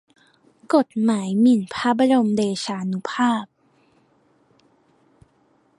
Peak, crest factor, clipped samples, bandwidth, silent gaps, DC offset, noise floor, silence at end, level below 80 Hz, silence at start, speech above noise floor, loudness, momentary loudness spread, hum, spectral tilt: -4 dBFS; 18 dB; under 0.1%; 11.5 kHz; none; under 0.1%; -61 dBFS; 2.35 s; -68 dBFS; 0.7 s; 42 dB; -20 LUFS; 9 LU; none; -5.5 dB/octave